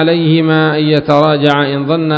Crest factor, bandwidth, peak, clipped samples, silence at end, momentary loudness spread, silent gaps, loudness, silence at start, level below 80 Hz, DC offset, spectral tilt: 10 dB; 7.6 kHz; 0 dBFS; 0.2%; 0 s; 3 LU; none; -11 LUFS; 0 s; -52 dBFS; under 0.1%; -8 dB/octave